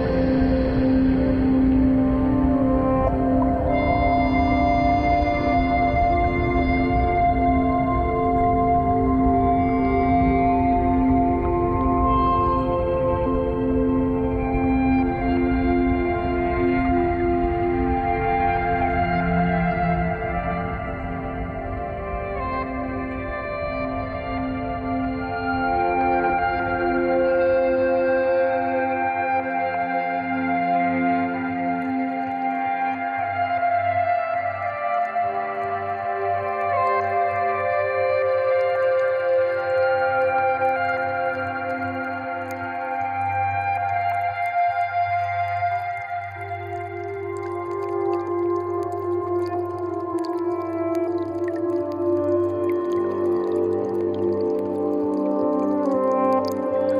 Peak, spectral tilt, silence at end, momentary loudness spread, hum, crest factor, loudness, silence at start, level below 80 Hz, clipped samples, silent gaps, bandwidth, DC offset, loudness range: -8 dBFS; -9 dB/octave; 0 s; 8 LU; none; 14 dB; -22 LUFS; 0 s; -34 dBFS; under 0.1%; none; 6.6 kHz; under 0.1%; 6 LU